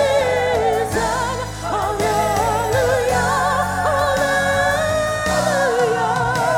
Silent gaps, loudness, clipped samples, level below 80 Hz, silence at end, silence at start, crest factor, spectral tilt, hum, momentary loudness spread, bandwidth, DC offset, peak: none; -18 LUFS; under 0.1%; -38 dBFS; 0 s; 0 s; 12 dB; -4 dB/octave; none; 3 LU; 18 kHz; under 0.1%; -6 dBFS